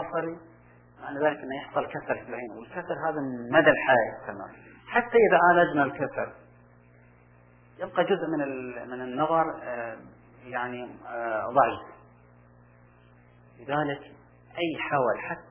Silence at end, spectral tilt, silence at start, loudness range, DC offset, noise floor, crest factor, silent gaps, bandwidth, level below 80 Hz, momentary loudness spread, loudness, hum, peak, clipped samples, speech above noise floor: 0.1 s; -9 dB/octave; 0 s; 9 LU; under 0.1%; -56 dBFS; 22 dB; none; 3.5 kHz; -64 dBFS; 18 LU; -27 LUFS; 60 Hz at -60 dBFS; -6 dBFS; under 0.1%; 29 dB